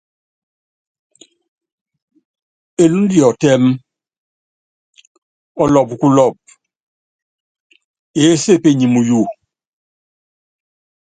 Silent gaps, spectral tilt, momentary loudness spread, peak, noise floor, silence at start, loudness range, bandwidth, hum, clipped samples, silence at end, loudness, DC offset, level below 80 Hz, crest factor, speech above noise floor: 4.18-4.93 s, 5.07-5.55 s, 6.80-7.70 s, 7.84-8.14 s; -6 dB/octave; 11 LU; 0 dBFS; under -90 dBFS; 2.8 s; 2 LU; 9.4 kHz; none; under 0.1%; 1.85 s; -13 LUFS; under 0.1%; -54 dBFS; 18 dB; over 79 dB